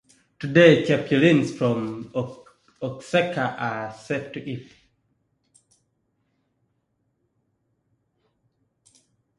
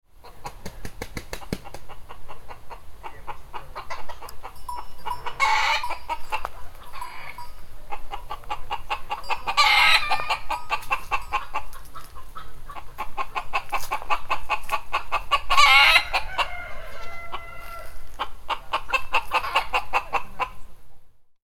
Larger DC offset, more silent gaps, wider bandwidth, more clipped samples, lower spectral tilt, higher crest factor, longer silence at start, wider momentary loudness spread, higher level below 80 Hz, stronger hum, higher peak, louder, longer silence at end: neither; neither; second, 11 kHz vs 16.5 kHz; neither; first, -6.5 dB/octave vs -1.5 dB/octave; about the same, 24 dB vs 22 dB; first, 0.4 s vs 0.15 s; second, 19 LU vs 25 LU; second, -64 dBFS vs -40 dBFS; neither; about the same, -2 dBFS vs 0 dBFS; about the same, -22 LUFS vs -23 LUFS; first, 4.75 s vs 0.25 s